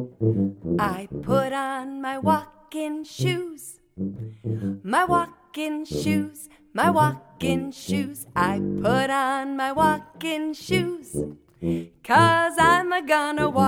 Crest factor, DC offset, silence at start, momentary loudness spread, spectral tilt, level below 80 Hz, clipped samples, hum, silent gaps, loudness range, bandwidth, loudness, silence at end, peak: 18 dB; under 0.1%; 0 s; 14 LU; -5.5 dB/octave; -52 dBFS; under 0.1%; none; none; 5 LU; 17.5 kHz; -24 LUFS; 0 s; -6 dBFS